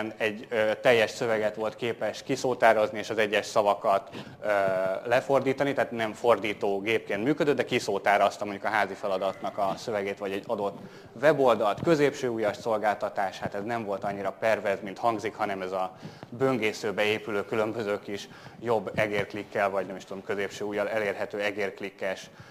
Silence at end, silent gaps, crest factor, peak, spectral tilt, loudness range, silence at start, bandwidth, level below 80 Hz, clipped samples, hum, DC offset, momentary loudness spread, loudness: 0 s; none; 22 dB; -6 dBFS; -5 dB/octave; 4 LU; 0 s; 15.5 kHz; -68 dBFS; under 0.1%; none; under 0.1%; 10 LU; -28 LUFS